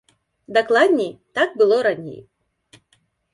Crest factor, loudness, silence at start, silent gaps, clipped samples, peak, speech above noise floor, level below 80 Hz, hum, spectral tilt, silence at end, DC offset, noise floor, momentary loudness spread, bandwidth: 18 dB; -19 LUFS; 0.5 s; none; under 0.1%; -2 dBFS; 46 dB; -68 dBFS; none; -5 dB/octave; 1.15 s; under 0.1%; -64 dBFS; 11 LU; 11.5 kHz